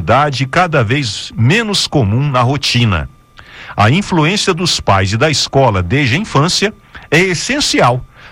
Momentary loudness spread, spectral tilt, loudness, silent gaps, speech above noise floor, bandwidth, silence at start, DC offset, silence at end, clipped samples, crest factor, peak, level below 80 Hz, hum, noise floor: 4 LU; -4.5 dB/octave; -12 LUFS; none; 24 dB; 16 kHz; 0 s; under 0.1%; 0 s; under 0.1%; 12 dB; 0 dBFS; -36 dBFS; none; -37 dBFS